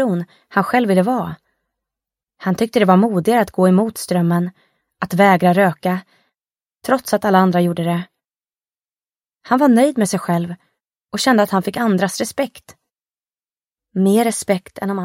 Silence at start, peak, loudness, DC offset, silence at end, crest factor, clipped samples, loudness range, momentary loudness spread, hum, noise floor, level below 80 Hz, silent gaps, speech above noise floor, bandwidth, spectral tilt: 0 s; 0 dBFS; -17 LUFS; under 0.1%; 0 s; 18 dB; under 0.1%; 4 LU; 13 LU; none; under -90 dBFS; -60 dBFS; none; over 74 dB; 16.5 kHz; -6 dB/octave